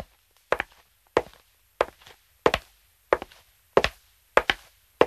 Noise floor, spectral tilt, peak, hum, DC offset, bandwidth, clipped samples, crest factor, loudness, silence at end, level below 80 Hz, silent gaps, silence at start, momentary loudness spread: -60 dBFS; -4 dB/octave; -2 dBFS; none; under 0.1%; 14 kHz; under 0.1%; 26 dB; -27 LUFS; 0 s; -50 dBFS; none; 0 s; 12 LU